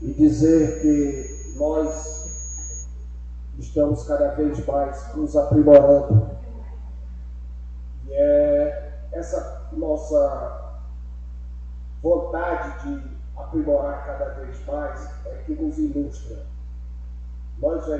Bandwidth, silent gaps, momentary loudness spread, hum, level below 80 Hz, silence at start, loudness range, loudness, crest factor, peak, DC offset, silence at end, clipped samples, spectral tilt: 8.2 kHz; none; 20 LU; 60 Hz at -35 dBFS; -34 dBFS; 0 s; 10 LU; -21 LUFS; 22 dB; 0 dBFS; under 0.1%; 0 s; under 0.1%; -8 dB/octave